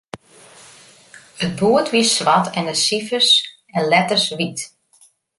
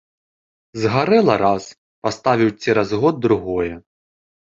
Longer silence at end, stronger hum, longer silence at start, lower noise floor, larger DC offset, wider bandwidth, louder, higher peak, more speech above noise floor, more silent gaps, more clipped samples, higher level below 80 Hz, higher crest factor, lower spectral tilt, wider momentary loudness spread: about the same, 0.7 s vs 0.8 s; neither; second, 0.15 s vs 0.75 s; second, -55 dBFS vs under -90 dBFS; neither; first, 11.5 kHz vs 7.6 kHz; about the same, -17 LUFS vs -18 LUFS; about the same, -2 dBFS vs 0 dBFS; second, 37 dB vs over 73 dB; second, none vs 1.78-2.02 s; neither; second, -60 dBFS vs -50 dBFS; about the same, 18 dB vs 18 dB; second, -3 dB/octave vs -6.5 dB/octave; about the same, 14 LU vs 12 LU